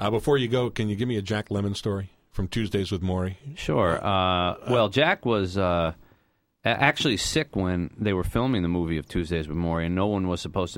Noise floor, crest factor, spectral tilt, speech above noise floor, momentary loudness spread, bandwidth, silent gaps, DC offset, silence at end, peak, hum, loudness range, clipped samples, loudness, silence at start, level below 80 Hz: -68 dBFS; 22 dB; -5.5 dB/octave; 43 dB; 8 LU; 16 kHz; none; under 0.1%; 0 s; -4 dBFS; none; 3 LU; under 0.1%; -25 LUFS; 0 s; -44 dBFS